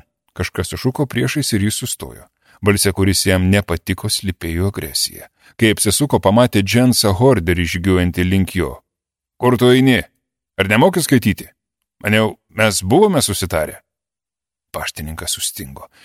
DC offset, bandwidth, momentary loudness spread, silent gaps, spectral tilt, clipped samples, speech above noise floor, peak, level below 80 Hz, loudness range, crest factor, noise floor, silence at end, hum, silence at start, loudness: under 0.1%; 16.5 kHz; 12 LU; none; -4.5 dB/octave; under 0.1%; 73 dB; 0 dBFS; -40 dBFS; 3 LU; 16 dB; -89 dBFS; 0.2 s; none; 0.35 s; -16 LUFS